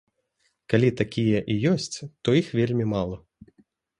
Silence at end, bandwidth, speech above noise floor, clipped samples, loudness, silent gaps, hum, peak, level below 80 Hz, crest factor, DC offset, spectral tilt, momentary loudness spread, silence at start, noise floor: 0.8 s; 11 kHz; 48 dB; under 0.1%; -24 LUFS; none; none; -6 dBFS; -54 dBFS; 20 dB; under 0.1%; -6.5 dB/octave; 8 LU; 0.7 s; -72 dBFS